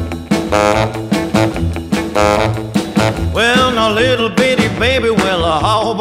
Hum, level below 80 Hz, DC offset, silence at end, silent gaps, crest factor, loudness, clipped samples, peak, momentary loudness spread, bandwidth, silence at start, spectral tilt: none; -30 dBFS; 0.1%; 0 s; none; 14 dB; -14 LUFS; under 0.1%; 0 dBFS; 6 LU; 16 kHz; 0 s; -5 dB/octave